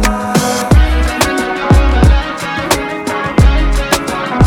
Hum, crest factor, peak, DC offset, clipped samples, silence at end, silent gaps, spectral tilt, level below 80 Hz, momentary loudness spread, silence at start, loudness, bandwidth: none; 10 dB; 0 dBFS; under 0.1%; under 0.1%; 0 s; none; -5 dB/octave; -14 dBFS; 7 LU; 0 s; -13 LUFS; 18 kHz